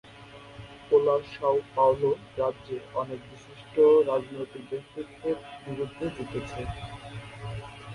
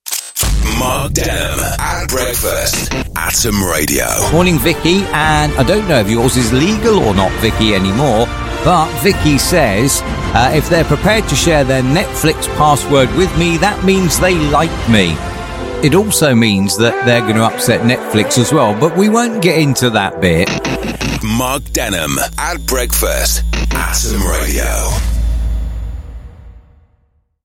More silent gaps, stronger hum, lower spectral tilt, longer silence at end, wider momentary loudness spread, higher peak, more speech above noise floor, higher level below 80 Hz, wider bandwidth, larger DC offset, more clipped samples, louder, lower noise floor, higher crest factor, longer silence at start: neither; neither; first, -7 dB/octave vs -4 dB/octave; second, 0 s vs 0.85 s; first, 21 LU vs 6 LU; second, -10 dBFS vs 0 dBFS; second, 20 dB vs 45 dB; second, -54 dBFS vs -22 dBFS; second, 11 kHz vs 16.5 kHz; neither; neither; second, -27 LUFS vs -13 LUFS; second, -48 dBFS vs -57 dBFS; first, 18 dB vs 12 dB; about the same, 0.05 s vs 0.05 s